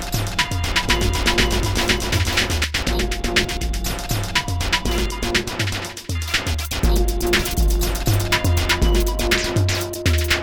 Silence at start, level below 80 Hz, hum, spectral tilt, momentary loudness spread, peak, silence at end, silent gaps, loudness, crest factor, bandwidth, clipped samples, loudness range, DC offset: 0 s; -24 dBFS; none; -3.5 dB/octave; 5 LU; -4 dBFS; 0 s; none; -20 LUFS; 16 dB; over 20 kHz; under 0.1%; 3 LU; 0.2%